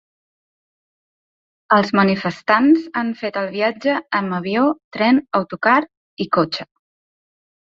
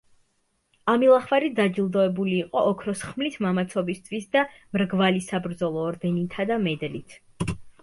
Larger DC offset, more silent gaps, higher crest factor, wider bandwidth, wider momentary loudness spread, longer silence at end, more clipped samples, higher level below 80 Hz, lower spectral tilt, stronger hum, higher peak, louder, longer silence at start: neither; first, 4.84-4.91 s, 5.97-6.17 s vs none; about the same, 18 dB vs 18 dB; second, 7.4 kHz vs 11.5 kHz; second, 8 LU vs 11 LU; first, 1 s vs 0.1 s; neither; second, -62 dBFS vs -54 dBFS; about the same, -7 dB/octave vs -6 dB/octave; neither; first, -2 dBFS vs -6 dBFS; first, -18 LUFS vs -25 LUFS; first, 1.7 s vs 0.85 s